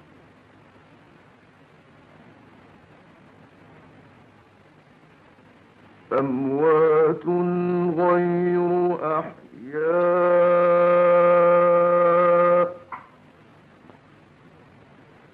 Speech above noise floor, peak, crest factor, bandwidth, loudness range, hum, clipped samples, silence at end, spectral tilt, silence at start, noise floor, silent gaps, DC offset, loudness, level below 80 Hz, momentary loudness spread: 33 dB; -10 dBFS; 14 dB; 4.3 kHz; 8 LU; none; under 0.1%; 2.35 s; -10 dB/octave; 6.1 s; -53 dBFS; none; under 0.1%; -19 LUFS; -70 dBFS; 11 LU